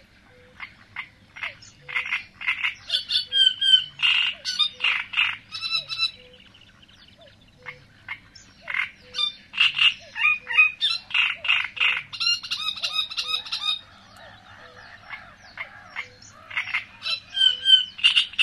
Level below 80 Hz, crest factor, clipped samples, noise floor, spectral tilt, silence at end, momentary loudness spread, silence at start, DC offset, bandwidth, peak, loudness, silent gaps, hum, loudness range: -62 dBFS; 22 dB; under 0.1%; -53 dBFS; 1 dB/octave; 0 s; 21 LU; 0.6 s; under 0.1%; 13 kHz; -4 dBFS; -21 LUFS; none; none; 12 LU